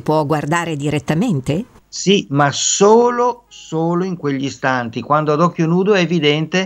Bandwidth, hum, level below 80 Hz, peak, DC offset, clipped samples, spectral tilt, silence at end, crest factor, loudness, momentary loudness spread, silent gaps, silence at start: 13 kHz; none; -52 dBFS; 0 dBFS; under 0.1%; under 0.1%; -4.5 dB/octave; 0 s; 16 dB; -16 LUFS; 9 LU; none; 0.05 s